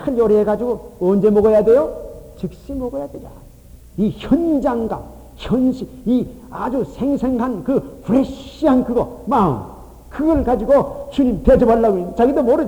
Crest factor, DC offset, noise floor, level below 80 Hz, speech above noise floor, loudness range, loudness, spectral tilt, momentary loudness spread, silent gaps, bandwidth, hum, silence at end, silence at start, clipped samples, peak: 16 dB; under 0.1%; -41 dBFS; -36 dBFS; 25 dB; 5 LU; -17 LUFS; -8.5 dB/octave; 16 LU; none; 20 kHz; none; 0 s; 0 s; under 0.1%; 0 dBFS